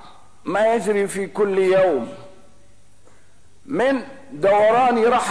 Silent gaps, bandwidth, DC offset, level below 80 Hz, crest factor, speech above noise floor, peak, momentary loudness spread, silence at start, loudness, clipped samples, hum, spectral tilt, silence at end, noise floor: none; 11 kHz; 0.8%; -58 dBFS; 12 dB; 37 dB; -8 dBFS; 12 LU; 0.45 s; -19 LUFS; under 0.1%; none; -5 dB/octave; 0 s; -55 dBFS